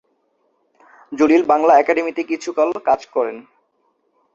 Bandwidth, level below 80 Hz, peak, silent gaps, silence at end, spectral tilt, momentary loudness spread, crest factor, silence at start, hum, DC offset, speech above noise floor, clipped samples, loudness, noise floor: 7.8 kHz; -62 dBFS; 0 dBFS; none; 0.95 s; -4.5 dB/octave; 12 LU; 18 dB; 1.1 s; none; under 0.1%; 49 dB; under 0.1%; -17 LUFS; -65 dBFS